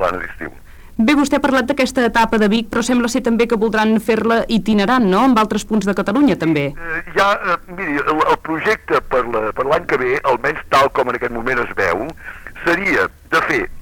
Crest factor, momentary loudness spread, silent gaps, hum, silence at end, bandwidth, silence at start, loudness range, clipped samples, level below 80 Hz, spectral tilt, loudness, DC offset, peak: 14 dB; 7 LU; none; none; 0 s; 18.5 kHz; 0 s; 2 LU; under 0.1%; -38 dBFS; -5 dB/octave; -16 LUFS; under 0.1%; -4 dBFS